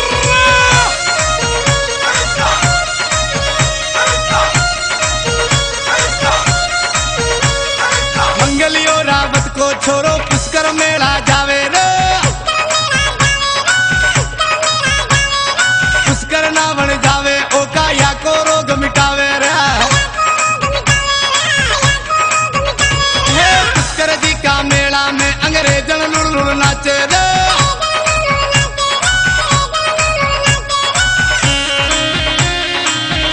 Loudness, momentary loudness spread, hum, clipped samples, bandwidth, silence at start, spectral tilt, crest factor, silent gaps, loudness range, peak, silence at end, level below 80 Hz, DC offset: -11 LUFS; 3 LU; none; under 0.1%; 10.5 kHz; 0 s; -2.5 dB/octave; 12 dB; none; 1 LU; 0 dBFS; 0 s; -26 dBFS; under 0.1%